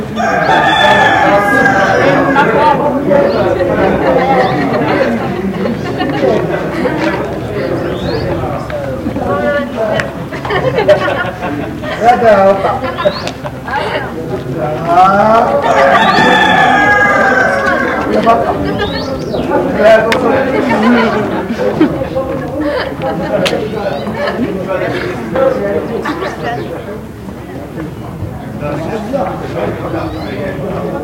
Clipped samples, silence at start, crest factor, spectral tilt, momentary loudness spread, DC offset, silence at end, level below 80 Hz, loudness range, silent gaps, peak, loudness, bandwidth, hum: 0.3%; 0 s; 12 dB; -6 dB/octave; 12 LU; under 0.1%; 0 s; -36 dBFS; 9 LU; none; 0 dBFS; -12 LUFS; 17 kHz; none